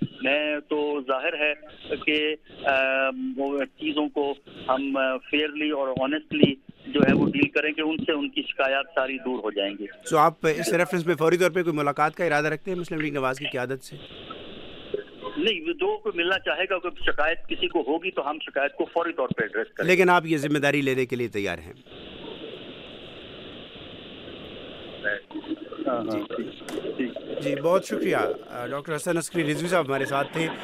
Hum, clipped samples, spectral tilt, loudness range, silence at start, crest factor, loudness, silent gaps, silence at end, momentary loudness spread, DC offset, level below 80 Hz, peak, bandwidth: none; under 0.1%; -5 dB/octave; 9 LU; 0 s; 26 dB; -25 LUFS; none; 0 s; 18 LU; under 0.1%; -54 dBFS; 0 dBFS; 15.5 kHz